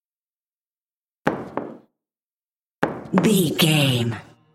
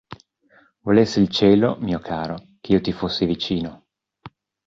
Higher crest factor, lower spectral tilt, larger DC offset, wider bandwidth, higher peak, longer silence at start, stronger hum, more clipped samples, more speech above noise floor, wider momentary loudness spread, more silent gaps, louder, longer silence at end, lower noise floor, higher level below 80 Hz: first, 24 dB vs 18 dB; second, -5 dB/octave vs -6.5 dB/octave; neither; first, 16.5 kHz vs 7.6 kHz; about the same, 0 dBFS vs -2 dBFS; first, 1.25 s vs 0.1 s; neither; neither; first, over 71 dB vs 38 dB; about the same, 15 LU vs 15 LU; first, 2.22-2.30 s, 2.36-2.40 s, 2.59-2.70 s, 2.77-2.82 s vs none; about the same, -21 LUFS vs -20 LUFS; about the same, 0.3 s vs 0.4 s; first, under -90 dBFS vs -57 dBFS; second, -62 dBFS vs -48 dBFS